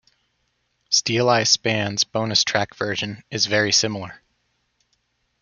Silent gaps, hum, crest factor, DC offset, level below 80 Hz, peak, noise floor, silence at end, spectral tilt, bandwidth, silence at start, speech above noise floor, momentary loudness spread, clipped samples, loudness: none; 60 Hz at -55 dBFS; 22 dB; under 0.1%; -64 dBFS; -2 dBFS; -70 dBFS; 1.25 s; -2.5 dB/octave; 11 kHz; 0.9 s; 49 dB; 10 LU; under 0.1%; -20 LUFS